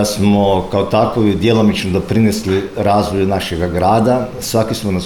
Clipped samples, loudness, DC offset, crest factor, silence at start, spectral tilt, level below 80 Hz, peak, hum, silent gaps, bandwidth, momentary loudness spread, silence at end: under 0.1%; -14 LUFS; under 0.1%; 12 dB; 0 s; -6 dB/octave; -36 dBFS; -2 dBFS; none; none; 17.5 kHz; 5 LU; 0 s